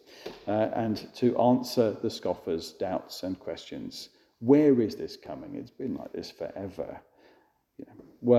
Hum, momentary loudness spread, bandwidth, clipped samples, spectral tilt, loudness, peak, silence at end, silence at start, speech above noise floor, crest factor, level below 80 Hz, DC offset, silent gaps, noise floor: none; 19 LU; 14.5 kHz; under 0.1%; -6.5 dB/octave; -29 LUFS; -8 dBFS; 0 s; 0.1 s; 36 dB; 20 dB; -66 dBFS; under 0.1%; none; -64 dBFS